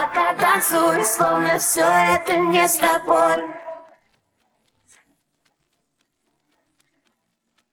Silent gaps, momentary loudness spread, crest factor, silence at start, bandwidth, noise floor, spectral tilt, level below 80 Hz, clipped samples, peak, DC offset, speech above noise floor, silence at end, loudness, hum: none; 11 LU; 18 dB; 0 s; over 20 kHz; -72 dBFS; -2.5 dB/octave; -60 dBFS; under 0.1%; -4 dBFS; under 0.1%; 54 dB; 3.9 s; -18 LUFS; none